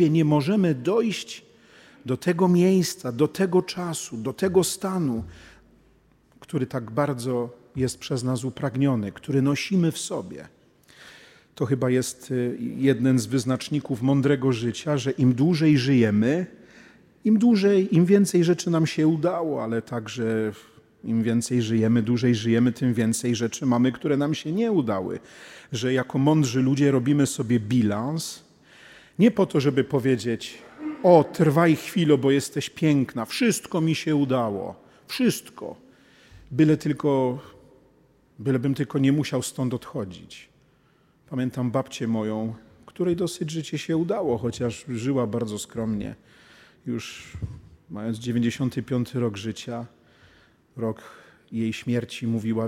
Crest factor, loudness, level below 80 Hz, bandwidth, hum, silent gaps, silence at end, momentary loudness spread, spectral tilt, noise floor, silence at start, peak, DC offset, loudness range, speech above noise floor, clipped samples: 22 dB; -24 LUFS; -60 dBFS; 16 kHz; none; none; 0 s; 14 LU; -6 dB/octave; -61 dBFS; 0 s; -2 dBFS; under 0.1%; 8 LU; 38 dB; under 0.1%